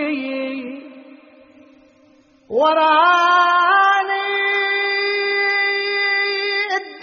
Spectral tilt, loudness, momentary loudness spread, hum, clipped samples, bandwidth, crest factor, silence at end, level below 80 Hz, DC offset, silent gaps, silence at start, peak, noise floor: 2.5 dB/octave; -16 LUFS; 11 LU; none; under 0.1%; 6.8 kHz; 16 dB; 0 s; -72 dBFS; under 0.1%; none; 0 s; -2 dBFS; -53 dBFS